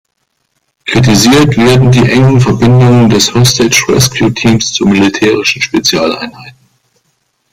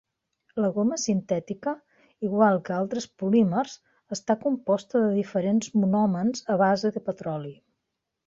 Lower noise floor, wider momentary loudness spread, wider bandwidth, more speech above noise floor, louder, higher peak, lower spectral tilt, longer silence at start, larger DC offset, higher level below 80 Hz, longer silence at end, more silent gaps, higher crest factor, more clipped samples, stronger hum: second, -63 dBFS vs -82 dBFS; second, 5 LU vs 12 LU; first, 16 kHz vs 7.8 kHz; about the same, 56 dB vs 57 dB; first, -7 LUFS vs -26 LUFS; first, 0 dBFS vs -8 dBFS; about the same, -5 dB/octave vs -6 dB/octave; first, 0.85 s vs 0.55 s; neither; first, -34 dBFS vs -68 dBFS; first, 1 s vs 0.75 s; neither; second, 8 dB vs 18 dB; first, 0.1% vs under 0.1%; neither